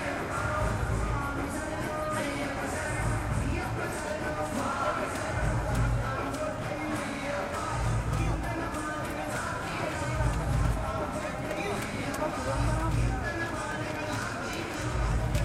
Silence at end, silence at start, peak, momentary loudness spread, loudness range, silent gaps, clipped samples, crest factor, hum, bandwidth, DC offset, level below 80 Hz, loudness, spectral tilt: 0 s; 0 s; -14 dBFS; 4 LU; 1 LU; none; under 0.1%; 16 dB; none; 15.5 kHz; under 0.1%; -38 dBFS; -31 LUFS; -5.5 dB/octave